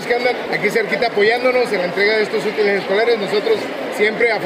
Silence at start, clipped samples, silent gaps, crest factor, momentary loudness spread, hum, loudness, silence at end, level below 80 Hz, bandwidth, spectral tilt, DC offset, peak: 0 s; under 0.1%; none; 14 dB; 4 LU; none; -17 LUFS; 0 s; -62 dBFS; 16 kHz; -4.5 dB/octave; under 0.1%; -4 dBFS